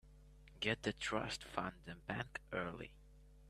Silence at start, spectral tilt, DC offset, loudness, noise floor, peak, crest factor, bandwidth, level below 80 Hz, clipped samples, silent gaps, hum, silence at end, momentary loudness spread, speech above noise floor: 0.05 s; -4.5 dB/octave; under 0.1%; -43 LUFS; -62 dBFS; -20 dBFS; 26 dB; 13.5 kHz; -62 dBFS; under 0.1%; none; none; 0 s; 10 LU; 19 dB